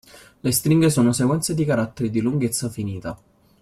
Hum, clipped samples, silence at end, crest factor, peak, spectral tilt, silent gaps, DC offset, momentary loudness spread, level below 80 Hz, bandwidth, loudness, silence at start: none; under 0.1%; 0.45 s; 16 dB; -6 dBFS; -5.5 dB/octave; none; under 0.1%; 12 LU; -52 dBFS; 16 kHz; -21 LUFS; 0.15 s